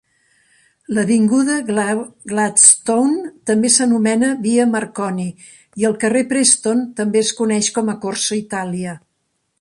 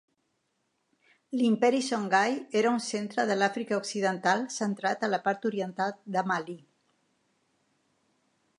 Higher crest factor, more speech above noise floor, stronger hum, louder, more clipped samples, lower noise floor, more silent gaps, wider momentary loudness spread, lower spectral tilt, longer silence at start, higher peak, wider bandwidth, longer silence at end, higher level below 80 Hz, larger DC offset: about the same, 18 dB vs 22 dB; first, 53 dB vs 49 dB; neither; first, -16 LUFS vs -28 LUFS; neither; second, -69 dBFS vs -77 dBFS; neither; first, 11 LU vs 7 LU; second, -3 dB/octave vs -4.5 dB/octave; second, 0.9 s vs 1.3 s; first, 0 dBFS vs -10 dBFS; about the same, 11.5 kHz vs 11 kHz; second, 0.6 s vs 2 s; first, -62 dBFS vs -82 dBFS; neither